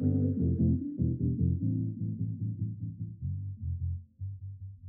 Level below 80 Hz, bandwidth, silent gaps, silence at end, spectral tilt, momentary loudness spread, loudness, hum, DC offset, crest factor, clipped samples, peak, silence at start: -46 dBFS; 0.9 kHz; none; 0 s; -17.5 dB/octave; 12 LU; -33 LUFS; none; under 0.1%; 14 dB; under 0.1%; -16 dBFS; 0 s